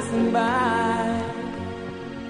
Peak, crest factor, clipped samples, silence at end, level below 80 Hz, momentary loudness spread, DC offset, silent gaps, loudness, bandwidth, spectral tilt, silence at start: -8 dBFS; 16 dB; under 0.1%; 0 s; -48 dBFS; 12 LU; under 0.1%; none; -24 LUFS; 10.5 kHz; -5.5 dB/octave; 0 s